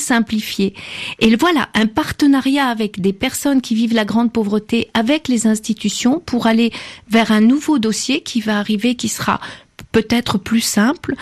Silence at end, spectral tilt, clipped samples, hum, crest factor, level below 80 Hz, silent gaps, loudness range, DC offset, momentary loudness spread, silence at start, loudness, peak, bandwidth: 0 s; -4 dB/octave; under 0.1%; none; 14 dB; -48 dBFS; none; 1 LU; under 0.1%; 6 LU; 0 s; -16 LUFS; -2 dBFS; 14.5 kHz